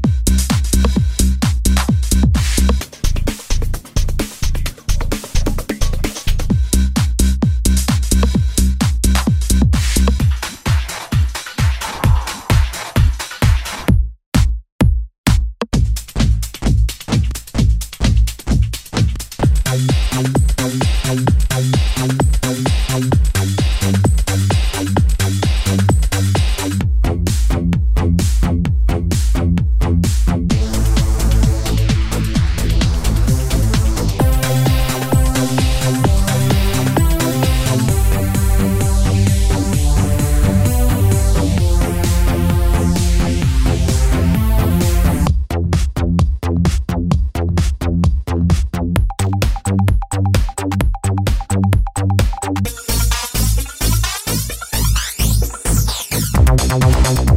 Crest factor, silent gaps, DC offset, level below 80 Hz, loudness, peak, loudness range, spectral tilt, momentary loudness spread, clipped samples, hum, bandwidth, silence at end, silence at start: 14 dB; 14.26-14.32 s, 14.72-14.79 s, 15.18-15.24 s; under 0.1%; -18 dBFS; -16 LUFS; 0 dBFS; 2 LU; -5.5 dB/octave; 4 LU; under 0.1%; none; 16.5 kHz; 0 s; 0 s